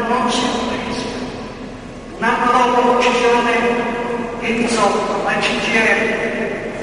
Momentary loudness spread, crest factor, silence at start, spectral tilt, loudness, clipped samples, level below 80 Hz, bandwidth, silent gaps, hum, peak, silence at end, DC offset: 14 LU; 16 dB; 0 s; -3.5 dB/octave; -16 LUFS; under 0.1%; -42 dBFS; 11.5 kHz; none; none; -2 dBFS; 0 s; under 0.1%